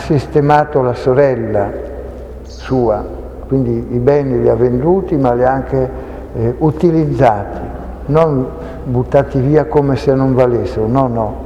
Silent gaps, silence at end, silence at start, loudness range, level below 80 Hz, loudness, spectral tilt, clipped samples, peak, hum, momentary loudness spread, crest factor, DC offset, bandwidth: none; 0 s; 0 s; 3 LU; -30 dBFS; -14 LUFS; -9 dB/octave; under 0.1%; 0 dBFS; none; 14 LU; 14 dB; under 0.1%; 9.2 kHz